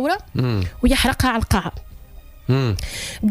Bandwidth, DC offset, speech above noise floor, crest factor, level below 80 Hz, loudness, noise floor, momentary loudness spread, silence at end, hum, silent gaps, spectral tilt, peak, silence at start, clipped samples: 15.5 kHz; under 0.1%; 21 dB; 16 dB; -30 dBFS; -20 LUFS; -41 dBFS; 12 LU; 0 s; none; none; -5 dB/octave; -6 dBFS; 0 s; under 0.1%